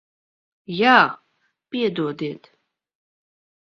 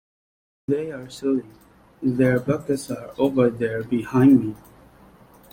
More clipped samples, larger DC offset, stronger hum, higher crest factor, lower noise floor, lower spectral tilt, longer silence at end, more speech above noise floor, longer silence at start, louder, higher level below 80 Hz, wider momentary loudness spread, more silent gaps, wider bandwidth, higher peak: neither; neither; neither; first, 24 dB vs 18 dB; first, -70 dBFS vs -50 dBFS; second, -6 dB/octave vs -7.5 dB/octave; first, 1.25 s vs 0.95 s; first, 50 dB vs 29 dB; about the same, 0.7 s vs 0.7 s; first, -19 LUFS vs -22 LUFS; second, -68 dBFS vs -56 dBFS; first, 20 LU vs 16 LU; neither; second, 6.4 kHz vs 16 kHz; first, 0 dBFS vs -6 dBFS